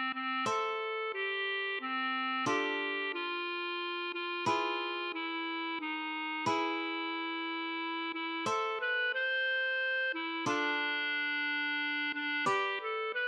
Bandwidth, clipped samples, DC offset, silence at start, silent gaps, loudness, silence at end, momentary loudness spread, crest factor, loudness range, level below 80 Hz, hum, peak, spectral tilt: 11.5 kHz; under 0.1%; under 0.1%; 0 s; none; -33 LUFS; 0 s; 5 LU; 16 dB; 3 LU; -86 dBFS; none; -18 dBFS; -3 dB/octave